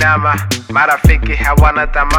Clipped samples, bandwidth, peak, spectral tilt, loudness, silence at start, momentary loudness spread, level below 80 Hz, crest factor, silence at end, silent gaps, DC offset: under 0.1%; 18 kHz; 0 dBFS; -5 dB/octave; -12 LUFS; 0 s; 5 LU; -16 dBFS; 12 dB; 0 s; none; under 0.1%